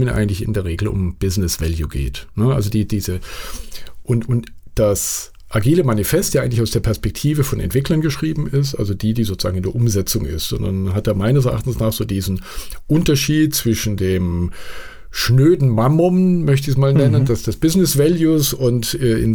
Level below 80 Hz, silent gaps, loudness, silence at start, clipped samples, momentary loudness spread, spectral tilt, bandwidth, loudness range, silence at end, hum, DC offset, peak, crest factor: -32 dBFS; none; -18 LUFS; 0 s; under 0.1%; 11 LU; -6 dB/octave; over 20 kHz; 6 LU; 0 s; none; under 0.1%; -4 dBFS; 14 dB